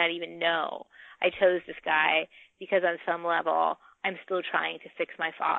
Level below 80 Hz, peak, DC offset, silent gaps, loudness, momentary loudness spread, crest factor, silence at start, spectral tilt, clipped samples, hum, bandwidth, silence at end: -74 dBFS; -10 dBFS; under 0.1%; none; -28 LUFS; 10 LU; 18 dB; 0 s; -6.5 dB/octave; under 0.1%; none; 4.2 kHz; 0 s